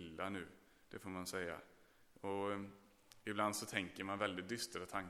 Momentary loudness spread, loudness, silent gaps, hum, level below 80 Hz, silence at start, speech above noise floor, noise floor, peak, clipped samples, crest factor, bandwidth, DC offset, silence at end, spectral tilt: 14 LU; -44 LUFS; none; none; -76 dBFS; 0 s; 24 dB; -67 dBFS; -22 dBFS; under 0.1%; 24 dB; 18.5 kHz; under 0.1%; 0 s; -3.5 dB/octave